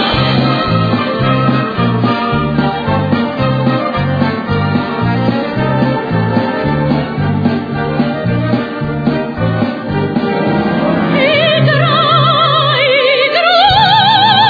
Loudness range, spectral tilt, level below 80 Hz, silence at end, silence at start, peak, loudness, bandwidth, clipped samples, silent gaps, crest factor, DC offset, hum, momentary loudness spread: 6 LU; -8 dB/octave; -36 dBFS; 0 s; 0 s; 0 dBFS; -12 LUFS; 5 kHz; under 0.1%; none; 12 dB; under 0.1%; none; 7 LU